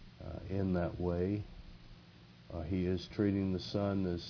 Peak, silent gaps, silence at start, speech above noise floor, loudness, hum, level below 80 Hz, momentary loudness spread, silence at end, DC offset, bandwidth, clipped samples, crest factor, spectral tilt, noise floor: -20 dBFS; none; 0 s; 23 dB; -36 LUFS; none; -54 dBFS; 16 LU; 0 s; under 0.1%; 5.4 kHz; under 0.1%; 18 dB; -7.5 dB/octave; -58 dBFS